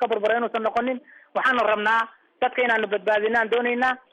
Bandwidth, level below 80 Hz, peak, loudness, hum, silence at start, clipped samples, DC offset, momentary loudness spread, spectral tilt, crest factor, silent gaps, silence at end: 10.5 kHz; -66 dBFS; -10 dBFS; -23 LUFS; none; 0 s; under 0.1%; under 0.1%; 7 LU; -4.5 dB/octave; 12 dB; none; 0.15 s